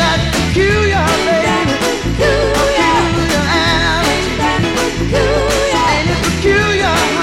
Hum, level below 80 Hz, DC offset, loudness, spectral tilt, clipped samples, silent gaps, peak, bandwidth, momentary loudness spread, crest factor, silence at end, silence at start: none; -24 dBFS; under 0.1%; -13 LUFS; -4.5 dB/octave; under 0.1%; none; -2 dBFS; 17 kHz; 3 LU; 10 dB; 0 s; 0 s